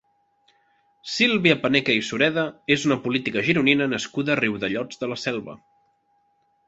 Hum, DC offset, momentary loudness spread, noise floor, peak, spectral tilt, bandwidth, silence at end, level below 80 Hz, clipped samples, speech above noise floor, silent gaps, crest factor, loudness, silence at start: none; under 0.1%; 11 LU; -66 dBFS; -2 dBFS; -4.5 dB/octave; 8 kHz; 1.1 s; -62 dBFS; under 0.1%; 44 dB; none; 22 dB; -22 LUFS; 1.05 s